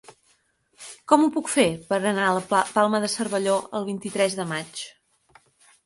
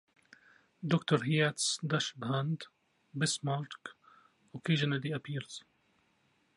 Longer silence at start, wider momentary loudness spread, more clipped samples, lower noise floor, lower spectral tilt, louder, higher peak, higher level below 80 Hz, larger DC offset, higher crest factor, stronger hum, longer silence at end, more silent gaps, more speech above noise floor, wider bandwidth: about the same, 0.8 s vs 0.8 s; about the same, 16 LU vs 17 LU; neither; second, -65 dBFS vs -73 dBFS; about the same, -4 dB/octave vs -4.5 dB/octave; first, -23 LUFS vs -33 LUFS; first, -2 dBFS vs -14 dBFS; first, -66 dBFS vs -78 dBFS; neither; about the same, 22 dB vs 22 dB; neither; about the same, 0.95 s vs 0.95 s; neither; about the same, 42 dB vs 40 dB; about the same, 11.5 kHz vs 11.5 kHz